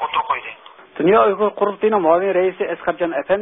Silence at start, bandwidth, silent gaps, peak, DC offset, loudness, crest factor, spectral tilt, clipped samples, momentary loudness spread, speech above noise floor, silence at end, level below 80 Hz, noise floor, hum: 0 s; 3.9 kHz; none; -2 dBFS; under 0.1%; -18 LUFS; 16 dB; -10.5 dB/octave; under 0.1%; 9 LU; 23 dB; 0 s; -56 dBFS; -40 dBFS; none